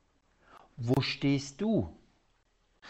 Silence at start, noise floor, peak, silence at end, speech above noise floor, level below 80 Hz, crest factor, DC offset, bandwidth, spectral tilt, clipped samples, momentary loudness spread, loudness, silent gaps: 0.55 s; -71 dBFS; -16 dBFS; 0 s; 41 dB; -58 dBFS; 18 dB; under 0.1%; 8.2 kHz; -6 dB/octave; under 0.1%; 9 LU; -31 LUFS; none